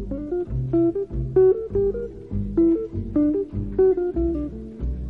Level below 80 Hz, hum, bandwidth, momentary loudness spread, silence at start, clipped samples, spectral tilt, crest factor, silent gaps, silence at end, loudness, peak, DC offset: -34 dBFS; none; 2.8 kHz; 12 LU; 0 s; under 0.1%; -12 dB/octave; 14 dB; none; 0 s; -23 LUFS; -8 dBFS; 0.2%